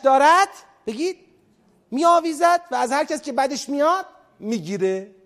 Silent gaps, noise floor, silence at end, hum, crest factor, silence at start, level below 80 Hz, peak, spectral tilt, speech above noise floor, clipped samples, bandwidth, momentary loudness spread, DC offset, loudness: none; -59 dBFS; 0.2 s; none; 18 dB; 0.05 s; -70 dBFS; -4 dBFS; -3.5 dB/octave; 39 dB; under 0.1%; 14.5 kHz; 16 LU; under 0.1%; -20 LUFS